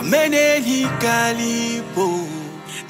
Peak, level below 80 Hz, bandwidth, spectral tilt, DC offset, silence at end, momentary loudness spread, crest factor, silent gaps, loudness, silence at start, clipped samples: -4 dBFS; -58 dBFS; 16 kHz; -3.5 dB/octave; under 0.1%; 0 s; 13 LU; 16 dB; none; -18 LUFS; 0 s; under 0.1%